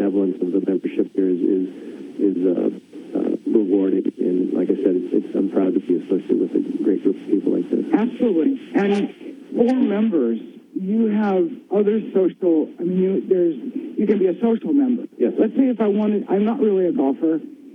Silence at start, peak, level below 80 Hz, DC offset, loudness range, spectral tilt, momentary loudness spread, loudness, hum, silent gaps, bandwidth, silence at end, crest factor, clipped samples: 0 s; -4 dBFS; -72 dBFS; under 0.1%; 2 LU; -9.5 dB/octave; 5 LU; -20 LUFS; none; none; 6.2 kHz; 0 s; 16 dB; under 0.1%